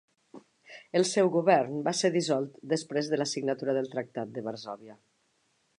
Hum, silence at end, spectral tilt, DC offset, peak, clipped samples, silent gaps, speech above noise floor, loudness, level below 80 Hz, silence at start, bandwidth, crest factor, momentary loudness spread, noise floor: none; 0.85 s; -4.5 dB/octave; under 0.1%; -8 dBFS; under 0.1%; none; 44 dB; -29 LUFS; -82 dBFS; 0.35 s; 11 kHz; 22 dB; 12 LU; -72 dBFS